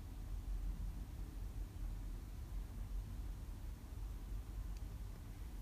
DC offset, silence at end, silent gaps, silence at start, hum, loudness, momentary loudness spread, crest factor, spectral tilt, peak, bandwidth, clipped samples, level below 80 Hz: under 0.1%; 0 s; none; 0 s; none; -50 LUFS; 4 LU; 12 dB; -6.5 dB/octave; -34 dBFS; 15.5 kHz; under 0.1%; -46 dBFS